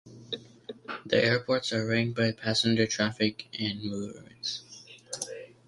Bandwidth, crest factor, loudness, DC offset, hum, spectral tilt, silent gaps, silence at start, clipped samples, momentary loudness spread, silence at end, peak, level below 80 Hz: 11.5 kHz; 22 dB; -29 LUFS; under 0.1%; none; -4.5 dB/octave; none; 0.05 s; under 0.1%; 16 LU; 0.2 s; -8 dBFS; -64 dBFS